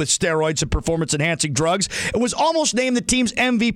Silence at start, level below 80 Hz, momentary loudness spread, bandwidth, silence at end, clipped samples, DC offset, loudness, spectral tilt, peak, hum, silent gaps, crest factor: 0 s; -36 dBFS; 3 LU; 15.5 kHz; 0 s; under 0.1%; under 0.1%; -19 LUFS; -3.5 dB/octave; -6 dBFS; none; none; 14 dB